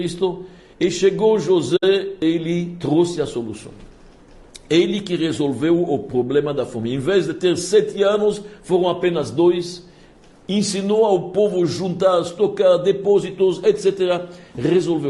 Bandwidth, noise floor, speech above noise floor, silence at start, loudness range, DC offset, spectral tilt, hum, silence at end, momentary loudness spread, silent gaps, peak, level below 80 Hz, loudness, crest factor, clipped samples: 11.5 kHz; -47 dBFS; 29 dB; 0 s; 4 LU; under 0.1%; -5.5 dB/octave; none; 0 s; 8 LU; none; -4 dBFS; -52 dBFS; -19 LUFS; 14 dB; under 0.1%